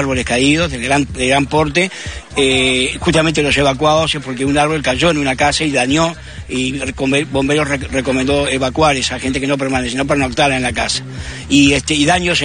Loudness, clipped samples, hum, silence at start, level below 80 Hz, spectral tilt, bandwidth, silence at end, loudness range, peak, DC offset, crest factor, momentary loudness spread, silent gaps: -14 LUFS; under 0.1%; none; 0 s; -32 dBFS; -4 dB/octave; 10 kHz; 0 s; 2 LU; 0 dBFS; 0.3%; 14 dB; 7 LU; none